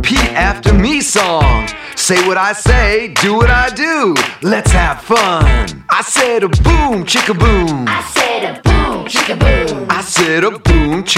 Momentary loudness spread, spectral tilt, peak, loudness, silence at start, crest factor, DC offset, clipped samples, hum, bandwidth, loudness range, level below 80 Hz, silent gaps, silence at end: 4 LU; -4 dB/octave; 0 dBFS; -12 LUFS; 0 s; 12 dB; under 0.1%; under 0.1%; none; 15.5 kHz; 1 LU; -18 dBFS; none; 0 s